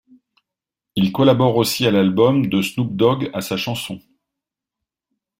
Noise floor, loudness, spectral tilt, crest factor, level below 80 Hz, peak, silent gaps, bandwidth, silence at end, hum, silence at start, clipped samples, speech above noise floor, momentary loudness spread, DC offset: -85 dBFS; -18 LUFS; -6 dB/octave; 18 dB; -56 dBFS; -2 dBFS; none; 16 kHz; 1.4 s; none; 0.95 s; under 0.1%; 68 dB; 11 LU; under 0.1%